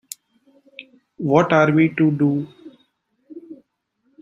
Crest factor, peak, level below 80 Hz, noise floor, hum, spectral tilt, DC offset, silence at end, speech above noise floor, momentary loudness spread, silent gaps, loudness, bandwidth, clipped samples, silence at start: 20 dB; -2 dBFS; -64 dBFS; -69 dBFS; none; -7 dB/octave; under 0.1%; 0.65 s; 52 dB; 26 LU; none; -18 LUFS; 15.5 kHz; under 0.1%; 0.8 s